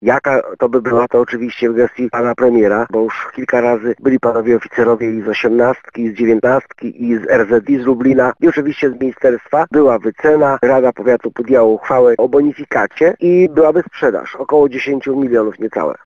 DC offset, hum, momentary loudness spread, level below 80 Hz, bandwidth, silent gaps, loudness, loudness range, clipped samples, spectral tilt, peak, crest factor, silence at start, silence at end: under 0.1%; none; 6 LU; -52 dBFS; 7 kHz; none; -13 LUFS; 2 LU; under 0.1%; -7.5 dB/octave; -2 dBFS; 12 dB; 0 s; 0.15 s